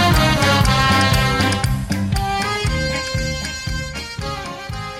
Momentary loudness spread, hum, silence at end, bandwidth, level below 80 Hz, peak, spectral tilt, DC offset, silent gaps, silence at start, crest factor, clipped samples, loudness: 12 LU; none; 0 s; 16.5 kHz; -28 dBFS; -2 dBFS; -4.5 dB/octave; under 0.1%; none; 0 s; 16 dB; under 0.1%; -18 LUFS